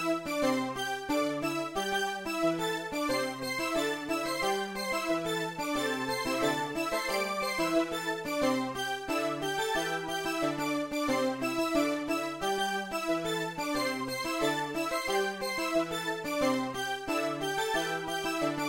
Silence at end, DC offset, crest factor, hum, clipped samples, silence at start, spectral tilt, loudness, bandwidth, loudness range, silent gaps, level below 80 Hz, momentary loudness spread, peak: 0 s; under 0.1%; 16 dB; none; under 0.1%; 0 s; -3.5 dB/octave; -31 LUFS; 16 kHz; 1 LU; none; -60 dBFS; 3 LU; -16 dBFS